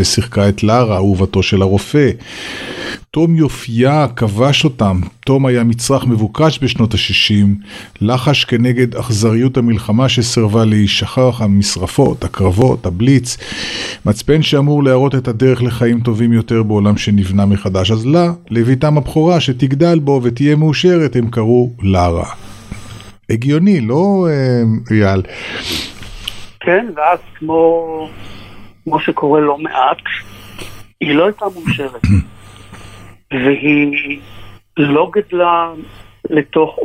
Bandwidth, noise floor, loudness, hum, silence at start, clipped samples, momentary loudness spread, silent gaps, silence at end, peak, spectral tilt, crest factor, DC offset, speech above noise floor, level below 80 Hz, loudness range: 13.5 kHz; -36 dBFS; -13 LUFS; none; 0 s; under 0.1%; 12 LU; none; 0 s; 0 dBFS; -6 dB/octave; 12 dB; under 0.1%; 23 dB; -36 dBFS; 4 LU